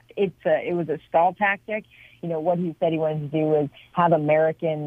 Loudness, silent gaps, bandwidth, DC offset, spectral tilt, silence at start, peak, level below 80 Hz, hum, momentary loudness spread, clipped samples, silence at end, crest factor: -23 LUFS; none; 3.8 kHz; under 0.1%; -9 dB/octave; 0.15 s; -6 dBFS; -64 dBFS; none; 8 LU; under 0.1%; 0 s; 16 dB